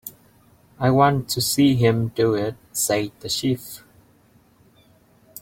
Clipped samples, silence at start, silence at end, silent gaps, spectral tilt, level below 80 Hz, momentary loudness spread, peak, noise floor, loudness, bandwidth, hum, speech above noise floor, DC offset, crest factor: under 0.1%; 0.05 s; 1.65 s; none; -5 dB/octave; -54 dBFS; 11 LU; -2 dBFS; -56 dBFS; -21 LUFS; 17 kHz; none; 36 dB; under 0.1%; 20 dB